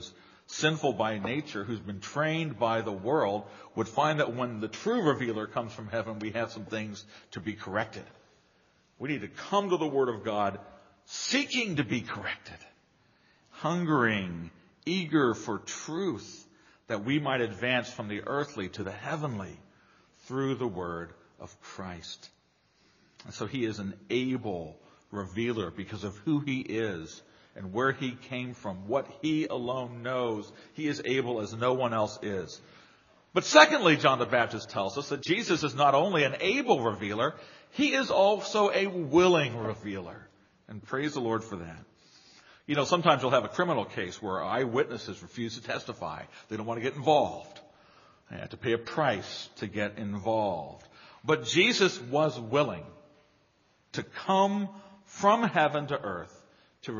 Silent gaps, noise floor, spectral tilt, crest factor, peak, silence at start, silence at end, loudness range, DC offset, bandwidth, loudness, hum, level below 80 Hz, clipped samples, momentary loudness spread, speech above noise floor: none; -68 dBFS; -3.5 dB/octave; 28 dB; -2 dBFS; 0 s; 0 s; 10 LU; under 0.1%; 7.2 kHz; -29 LUFS; none; -68 dBFS; under 0.1%; 16 LU; 39 dB